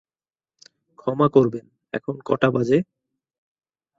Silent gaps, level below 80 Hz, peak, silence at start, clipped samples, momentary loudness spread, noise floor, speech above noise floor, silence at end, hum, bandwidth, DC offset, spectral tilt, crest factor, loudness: none; -62 dBFS; -2 dBFS; 1.05 s; under 0.1%; 15 LU; under -90 dBFS; over 70 dB; 1.15 s; none; 7.6 kHz; under 0.1%; -8 dB/octave; 22 dB; -21 LUFS